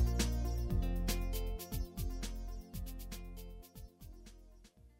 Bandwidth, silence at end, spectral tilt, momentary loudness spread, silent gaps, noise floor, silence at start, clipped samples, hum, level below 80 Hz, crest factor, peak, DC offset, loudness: 16 kHz; 0.1 s; -5 dB/octave; 19 LU; none; -60 dBFS; 0 s; under 0.1%; none; -40 dBFS; 18 dB; -20 dBFS; under 0.1%; -41 LUFS